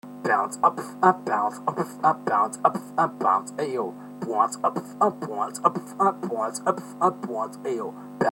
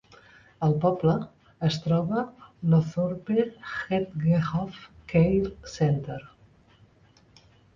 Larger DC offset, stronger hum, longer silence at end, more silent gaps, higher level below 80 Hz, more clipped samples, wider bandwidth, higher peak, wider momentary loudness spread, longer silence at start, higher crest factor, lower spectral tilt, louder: neither; neither; second, 0 s vs 1.5 s; neither; second, -74 dBFS vs -52 dBFS; neither; first, 17 kHz vs 7.4 kHz; first, -4 dBFS vs -10 dBFS; second, 9 LU vs 12 LU; second, 0.05 s vs 0.6 s; first, 22 dB vs 16 dB; second, -5.5 dB/octave vs -8 dB/octave; about the same, -25 LUFS vs -26 LUFS